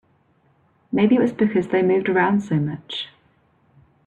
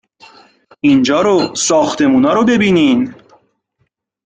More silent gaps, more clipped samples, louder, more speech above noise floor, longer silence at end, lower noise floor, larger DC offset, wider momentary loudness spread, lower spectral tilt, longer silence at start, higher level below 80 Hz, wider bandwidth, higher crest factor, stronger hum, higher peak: neither; neither; second, -20 LUFS vs -12 LUFS; second, 42 dB vs 54 dB; second, 1 s vs 1.15 s; second, -61 dBFS vs -65 dBFS; neither; first, 12 LU vs 4 LU; first, -7.5 dB/octave vs -4.5 dB/octave; about the same, 0.9 s vs 0.85 s; second, -62 dBFS vs -52 dBFS; second, 8.2 kHz vs 9.4 kHz; about the same, 16 dB vs 12 dB; neither; second, -6 dBFS vs -2 dBFS